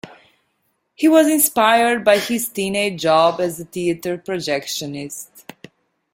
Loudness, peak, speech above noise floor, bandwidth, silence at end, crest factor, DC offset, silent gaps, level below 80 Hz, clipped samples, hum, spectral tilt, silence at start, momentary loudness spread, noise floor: -17 LUFS; -2 dBFS; 51 dB; 16.5 kHz; 0.75 s; 18 dB; under 0.1%; none; -60 dBFS; under 0.1%; none; -3.5 dB/octave; 0.05 s; 13 LU; -69 dBFS